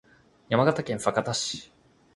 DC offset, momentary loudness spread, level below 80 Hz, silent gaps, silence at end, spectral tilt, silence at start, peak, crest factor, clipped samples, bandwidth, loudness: under 0.1%; 8 LU; -62 dBFS; none; 0.5 s; -4.5 dB/octave; 0.5 s; -6 dBFS; 22 dB; under 0.1%; 11.5 kHz; -26 LUFS